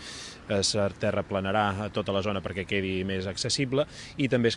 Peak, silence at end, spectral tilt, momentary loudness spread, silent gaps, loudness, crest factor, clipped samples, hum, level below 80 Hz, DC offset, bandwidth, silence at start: -10 dBFS; 0 s; -4.5 dB/octave; 5 LU; none; -28 LUFS; 18 dB; under 0.1%; none; -56 dBFS; under 0.1%; 11.5 kHz; 0 s